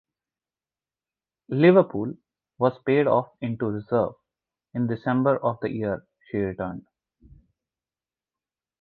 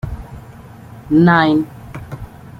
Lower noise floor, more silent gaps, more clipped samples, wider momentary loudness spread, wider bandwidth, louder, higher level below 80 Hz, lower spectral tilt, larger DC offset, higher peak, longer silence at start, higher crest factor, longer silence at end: first, under -90 dBFS vs -37 dBFS; neither; neither; second, 15 LU vs 25 LU; second, 4.6 kHz vs 7 kHz; second, -24 LUFS vs -13 LUFS; second, -60 dBFS vs -38 dBFS; first, -11 dB/octave vs -8 dB/octave; neither; second, -4 dBFS vs 0 dBFS; first, 1.5 s vs 0.05 s; first, 22 dB vs 16 dB; first, 2 s vs 0.35 s